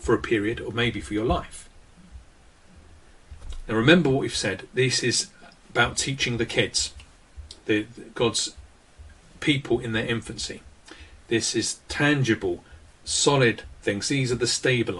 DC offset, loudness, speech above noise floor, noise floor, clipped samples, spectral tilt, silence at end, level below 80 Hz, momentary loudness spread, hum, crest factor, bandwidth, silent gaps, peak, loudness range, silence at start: under 0.1%; -24 LUFS; 28 dB; -52 dBFS; under 0.1%; -4 dB/octave; 0 s; -46 dBFS; 13 LU; none; 22 dB; 11.5 kHz; none; -4 dBFS; 5 LU; 0 s